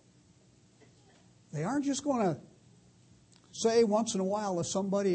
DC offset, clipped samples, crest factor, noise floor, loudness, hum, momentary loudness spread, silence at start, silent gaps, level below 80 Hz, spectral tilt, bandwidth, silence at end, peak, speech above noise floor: under 0.1%; under 0.1%; 18 dB; -63 dBFS; -31 LUFS; none; 12 LU; 1.55 s; none; -72 dBFS; -5 dB/octave; 8.8 kHz; 0 s; -16 dBFS; 33 dB